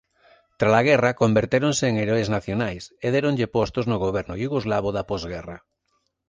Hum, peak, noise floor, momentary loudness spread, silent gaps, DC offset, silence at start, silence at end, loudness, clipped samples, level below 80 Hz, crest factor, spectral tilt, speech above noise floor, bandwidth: none; -4 dBFS; -72 dBFS; 10 LU; none; under 0.1%; 0.6 s; 0.7 s; -23 LUFS; under 0.1%; -48 dBFS; 20 dB; -5.5 dB/octave; 50 dB; 9.8 kHz